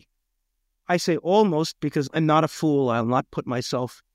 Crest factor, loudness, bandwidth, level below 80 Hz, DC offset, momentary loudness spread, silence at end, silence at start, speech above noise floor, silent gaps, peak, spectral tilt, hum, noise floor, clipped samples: 16 dB; -23 LUFS; 16 kHz; -62 dBFS; under 0.1%; 8 LU; 0.2 s; 0.9 s; 53 dB; none; -8 dBFS; -6 dB/octave; none; -76 dBFS; under 0.1%